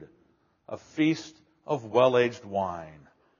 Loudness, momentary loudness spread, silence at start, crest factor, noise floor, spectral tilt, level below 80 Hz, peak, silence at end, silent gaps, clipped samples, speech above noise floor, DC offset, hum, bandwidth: -27 LUFS; 20 LU; 0 s; 20 dB; -67 dBFS; -4.5 dB/octave; -70 dBFS; -8 dBFS; 0.45 s; none; under 0.1%; 40 dB; under 0.1%; none; 7.2 kHz